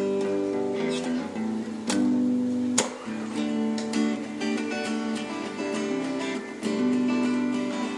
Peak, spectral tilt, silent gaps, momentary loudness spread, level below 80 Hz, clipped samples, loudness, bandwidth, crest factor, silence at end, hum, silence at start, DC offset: -6 dBFS; -4 dB/octave; none; 7 LU; -72 dBFS; under 0.1%; -27 LUFS; 11.5 kHz; 20 dB; 0 s; none; 0 s; under 0.1%